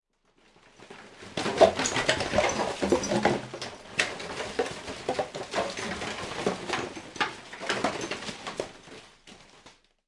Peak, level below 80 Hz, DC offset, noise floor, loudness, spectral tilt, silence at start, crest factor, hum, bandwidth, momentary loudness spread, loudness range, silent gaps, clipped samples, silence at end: -4 dBFS; -56 dBFS; under 0.1%; -64 dBFS; -29 LUFS; -3.5 dB/octave; 0.8 s; 26 dB; none; 11.5 kHz; 14 LU; 7 LU; none; under 0.1%; 0.35 s